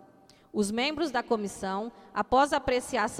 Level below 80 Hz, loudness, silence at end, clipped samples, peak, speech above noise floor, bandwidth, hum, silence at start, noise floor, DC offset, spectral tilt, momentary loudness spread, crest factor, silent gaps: -54 dBFS; -29 LUFS; 0 s; under 0.1%; -12 dBFS; 29 dB; 15.5 kHz; none; 0.55 s; -58 dBFS; under 0.1%; -4 dB/octave; 10 LU; 18 dB; none